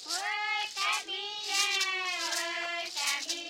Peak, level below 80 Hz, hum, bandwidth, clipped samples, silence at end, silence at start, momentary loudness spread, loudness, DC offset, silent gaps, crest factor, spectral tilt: -16 dBFS; -84 dBFS; none; 16.5 kHz; under 0.1%; 0 s; 0 s; 6 LU; -30 LUFS; under 0.1%; none; 18 dB; 2.5 dB/octave